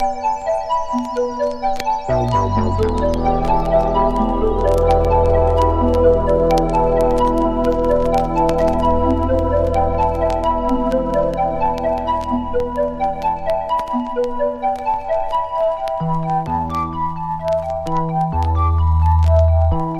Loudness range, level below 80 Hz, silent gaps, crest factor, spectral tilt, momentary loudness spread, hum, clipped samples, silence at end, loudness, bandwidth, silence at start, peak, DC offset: 5 LU; -24 dBFS; none; 14 dB; -8 dB/octave; 6 LU; none; under 0.1%; 0 s; -18 LUFS; 12.5 kHz; 0 s; -2 dBFS; under 0.1%